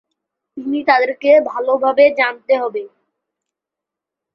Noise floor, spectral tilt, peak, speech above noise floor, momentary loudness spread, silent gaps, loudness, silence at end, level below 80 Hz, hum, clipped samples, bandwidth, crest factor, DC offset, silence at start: -85 dBFS; -5.5 dB/octave; -2 dBFS; 70 dB; 11 LU; none; -15 LUFS; 1.5 s; -68 dBFS; none; under 0.1%; 6 kHz; 16 dB; under 0.1%; 0.55 s